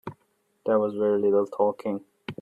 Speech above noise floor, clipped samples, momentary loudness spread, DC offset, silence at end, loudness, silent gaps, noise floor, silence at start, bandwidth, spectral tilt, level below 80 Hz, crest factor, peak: 46 dB; under 0.1%; 14 LU; under 0.1%; 0.1 s; -25 LUFS; none; -70 dBFS; 0.05 s; 4.9 kHz; -8.5 dB/octave; -70 dBFS; 16 dB; -10 dBFS